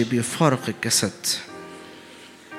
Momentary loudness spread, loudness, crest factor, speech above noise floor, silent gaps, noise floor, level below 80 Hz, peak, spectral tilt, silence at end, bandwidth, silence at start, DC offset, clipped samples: 22 LU; -22 LUFS; 22 dB; 22 dB; none; -45 dBFS; -66 dBFS; -2 dBFS; -3.5 dB/octave; 0 s; 16.5 kHz; 0 s; under 0.1%; under 0.1%